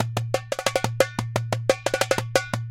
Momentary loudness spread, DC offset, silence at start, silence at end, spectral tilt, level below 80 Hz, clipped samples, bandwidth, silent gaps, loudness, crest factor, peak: 4 LU; under 0.1%; 0 s; 0 s; -4 dB/octave; -52 dBFS; under 0.1%; 17 kHz; none; -25 LUFS; 24 dB; -2 dBFS